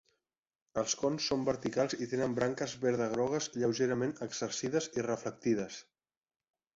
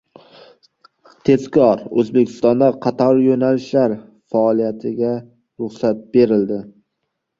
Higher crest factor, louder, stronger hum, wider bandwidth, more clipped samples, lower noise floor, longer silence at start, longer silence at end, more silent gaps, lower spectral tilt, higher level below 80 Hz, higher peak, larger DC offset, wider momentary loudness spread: about the same, 18 dB vs 16 dB; second, -34 LUFS vs -17 LUFS; neither; about the same, 8 kHz vs 7.4 kHz; neither; first, under -90 dBFS vs -75 dBFS; second, 0.75 s vs 1.25 s; first, 0.95 s vs 0.7 s; neither; second, -4.5 dB/octave vs -8 dB/octave; second, -68 dBFS vs -58 dBFS; second, -16 dBFS vs -2 dBFS; neither; second, 5 LU vs 9 LU